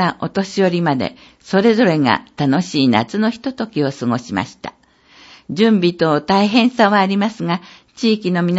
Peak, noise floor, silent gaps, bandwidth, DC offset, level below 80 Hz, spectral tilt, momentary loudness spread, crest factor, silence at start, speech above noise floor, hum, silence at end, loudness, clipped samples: 0 dBFS; -48 dBFS; none; 8 kHz; under 0.1%; -58 dBFS; -6 dB/octave; 10 LU; 16 dB; 0 s; 32 dB; none; 0 s; -16 LUFS; under 0.1%